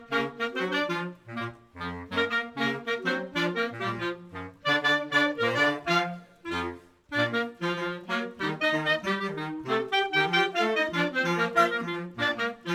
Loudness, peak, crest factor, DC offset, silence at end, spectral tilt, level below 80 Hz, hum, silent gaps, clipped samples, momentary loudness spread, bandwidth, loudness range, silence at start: -28 LUFS; -10 dBFS; 20 dB; under 0.1%; 0 s; -4.5 dB/octave; -66 dBFS; none; none; under 0.1%; 12 LU; 17 kHz; 4 LU; 0 s